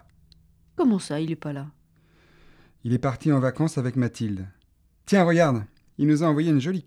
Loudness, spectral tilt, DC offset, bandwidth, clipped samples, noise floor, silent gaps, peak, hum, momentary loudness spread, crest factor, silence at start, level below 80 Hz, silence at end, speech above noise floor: -24 LUFS; -7 dB/octave; under 0.1%; 12.5 kHz; under 0.1%; -62 dBFS; none; -6 dBFS; none; 16 LU; 18 dB; 0.8 s; -58 dBFS; 0.05 s; 39 dB